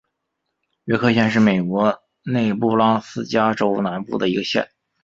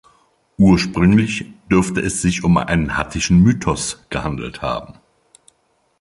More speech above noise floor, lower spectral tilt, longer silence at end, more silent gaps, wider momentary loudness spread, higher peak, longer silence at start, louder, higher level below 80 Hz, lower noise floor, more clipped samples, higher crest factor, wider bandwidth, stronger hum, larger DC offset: first, 58 dB vs 46 dB; about the same, -6.5 dB/octave vs -5.5 dB/octave; second, 0.4 s vs 1.1 s; neither; second, 7 LU vs 11 LU; about the same, -2 dBFS vs -2 dBFS; first, 0.85 s vs 0.6 s; about the same, -19 LUFS vs -17 LUFS; second, -56 dBFS vs -36 dBFS; first, -77 dBFS vs -63 dBFS; neither; about the same, 18 dB vs 16 dB; second, 7.6 kHz vs 11.5 kHz; neither; neither